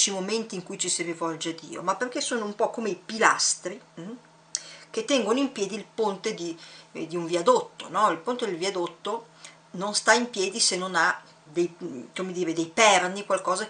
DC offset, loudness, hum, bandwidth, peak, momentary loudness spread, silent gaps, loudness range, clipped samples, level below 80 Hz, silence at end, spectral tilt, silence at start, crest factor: under 0.1%; -26 LUFS; none; 10 kHz; -4 dBFS; 15 LU; none; 5 LU; under 0.1%; -78 dBFS; 0 s; -2 dB/octave; 0 s; 24 dB